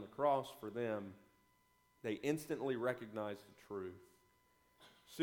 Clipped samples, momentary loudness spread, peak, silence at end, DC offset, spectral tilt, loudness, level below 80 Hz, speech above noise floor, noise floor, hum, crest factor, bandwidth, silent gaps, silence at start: under 0.1%; 16 LU; -22 dBFS; 0 s; under 0.1%; -6 dB/octave; -42 LUFS; -80 dBFS; 34 dB; -75 dBFS; 60 Hz at -75 dBFS; 20 dB; 19 kHz; none; 0 s